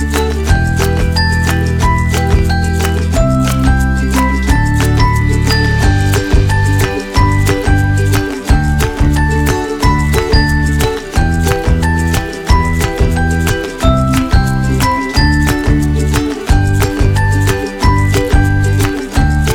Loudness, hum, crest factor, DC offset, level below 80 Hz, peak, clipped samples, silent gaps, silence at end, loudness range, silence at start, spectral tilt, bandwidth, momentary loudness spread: -13 LUFS; none; 10 dB; under 0.1%; -16 dBFS; 0 dBFS; under 0.1%; none; 0 s; 1 LU; 0 s; -5.5 dB/octave; 18.5 kHz; 3 LU